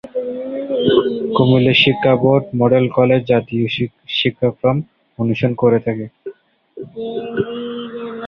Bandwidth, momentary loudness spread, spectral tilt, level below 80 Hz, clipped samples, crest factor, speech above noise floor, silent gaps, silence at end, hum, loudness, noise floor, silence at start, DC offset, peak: 6.2 kHz; 15 LU; -8.5 dB/octave; -52 dBFS; under 0.1%; 16 dB; 25 dB; none; 0 s; none; -16 LUFS; -40 dBFS; 0.05 s; under 0.1%; 0 dBFS